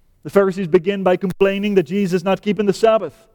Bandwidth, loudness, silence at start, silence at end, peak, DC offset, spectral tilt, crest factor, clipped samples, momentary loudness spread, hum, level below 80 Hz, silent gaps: 18 kHz; -18 LUFS; 0.25 s; 0.25 s; -2 dBFS; under 0.1%; -6.5 dB/octave; 14 dB; under 0.1%; 3 LU; none; -52 dBFS; none